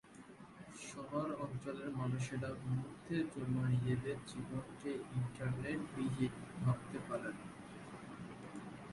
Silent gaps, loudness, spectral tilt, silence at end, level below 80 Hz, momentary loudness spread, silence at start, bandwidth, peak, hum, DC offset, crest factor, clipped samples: none; -42 LUFS; -7 dB/octave; 0 s; -66 dBFS; 13 LU; 0.05 s; 11.5 kHz; -24 dBFS; none; under 0.1%; 18 dB; under 0.1%